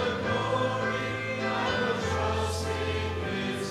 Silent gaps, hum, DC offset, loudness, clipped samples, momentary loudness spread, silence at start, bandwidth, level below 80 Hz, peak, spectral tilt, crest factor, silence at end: none; none; under 0.1%; -29 LUFS; under 0.1%; 3 LU; 0 s; 14 kHz; -52 dBFS; -16 dBFS; -5 dB/octave; 14 dB; 0 s